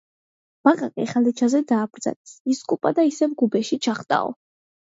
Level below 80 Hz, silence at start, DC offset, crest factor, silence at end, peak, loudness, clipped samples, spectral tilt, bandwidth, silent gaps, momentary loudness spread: -72 dBFS; 0.65 s; under 0.1%; 20 dB; 0.55 s; -2 dBFS; -22 LUFS; under 0.1%; -5 dB/octave; 7.8 kHz; 2.16-2.24 s, 2.40-2.45 s; 10 LU